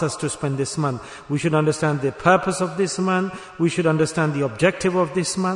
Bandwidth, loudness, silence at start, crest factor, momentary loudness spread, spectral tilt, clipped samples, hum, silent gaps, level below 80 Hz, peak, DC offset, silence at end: 11 kHz; -21 LUFS; 0 s; 18 dB; 6 LU; -5.5 dB/octave; under 0.1%; none; none; -54 dBFS; -4 dBFS; under 0.1%; 0 s